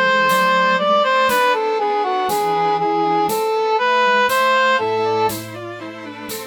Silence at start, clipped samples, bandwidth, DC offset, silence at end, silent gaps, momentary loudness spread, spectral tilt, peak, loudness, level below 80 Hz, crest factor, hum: 0 s; under 0.1%; over 20 kHz; under 0.1%; 0 s; none; 14 LU; -3 dB/octave; -6 dBFS; -16 LUFS; -62 dBFS; 12 dB; none